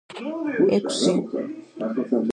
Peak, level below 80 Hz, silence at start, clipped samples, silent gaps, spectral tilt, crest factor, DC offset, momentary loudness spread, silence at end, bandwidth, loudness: -8 dBFS; -68 dBFS; 0.1 s; under 0.1%; none; -5 dB/octave; 16 dB; under 0.1%; 11 LU; 0 s; 11 kHz; -24 LUFS